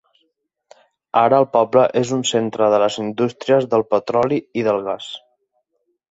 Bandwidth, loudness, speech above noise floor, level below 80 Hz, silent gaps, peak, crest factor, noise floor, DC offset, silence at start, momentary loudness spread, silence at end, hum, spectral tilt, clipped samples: 8 kHz; -18 LUFS; 53 dB; -62 dBFS; none; -2 dBFS; 18 dB; -70 dBFS; under 0.1%; 1.15 s; 7 LU; 0.95 s; none; -5 dB/octave; under 0.1%